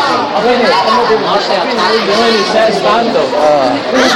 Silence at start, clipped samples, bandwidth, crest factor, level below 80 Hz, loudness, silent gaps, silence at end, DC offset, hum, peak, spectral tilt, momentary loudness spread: 0 s; under 0.1%; 16 kHz; 10 dB; -46 dBFS; -10 LUFS; none; 0 s; under 0.1%; none; 0 dBFS; -3.5 dB/octave; 2 LU